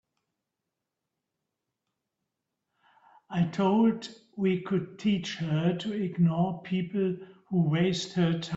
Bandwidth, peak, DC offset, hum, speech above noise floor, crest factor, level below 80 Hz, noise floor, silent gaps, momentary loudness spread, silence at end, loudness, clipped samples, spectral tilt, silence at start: 8 kHz; -14 dBFS; under 0.1%; none; 59 dB; 16 dB; -68 dBFS; -86 dBFS; none; 7 LU; 0 s; -28 LUFS; under 0.1%; -7 dB/octave; 3.3 s